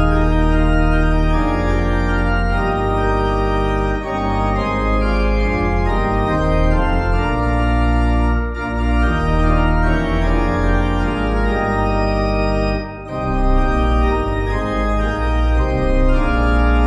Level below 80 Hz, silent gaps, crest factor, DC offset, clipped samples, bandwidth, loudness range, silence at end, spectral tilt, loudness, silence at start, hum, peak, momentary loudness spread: -18 dBFS; none; 12 dB; under 0.1%; under 0.1%; 8.8 kHz; 1 LU; 0 s; -7.5 dB/octave; -18 LUFS; 0 s; none; -4 dBFS; 3 LU